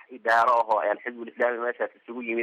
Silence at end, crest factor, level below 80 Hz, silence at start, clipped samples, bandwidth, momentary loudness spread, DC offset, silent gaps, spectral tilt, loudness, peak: 0 s; 14 dB; -78 dBFS; 0.1 s; under 0.1%; 12.5 kHz; 12 LU; under 0.1%; none; -4 dB/octave; -25 LUFS; -12 dBFS